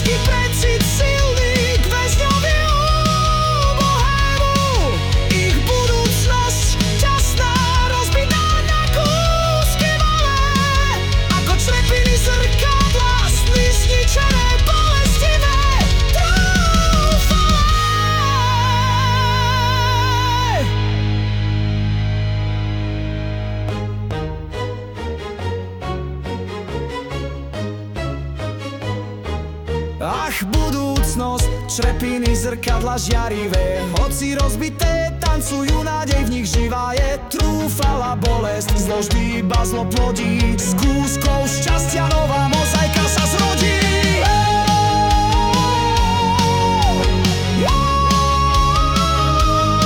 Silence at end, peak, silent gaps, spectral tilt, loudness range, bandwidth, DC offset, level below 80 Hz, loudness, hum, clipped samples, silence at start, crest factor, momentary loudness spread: 0 s; -4 dBFS; none; -4.5 dB/octave; 9 LU; 18 kHz; under 0.1%; -20 dBFS; -17 LUFS; none; under 0.1%; 0 s; 12 dB; 10 LU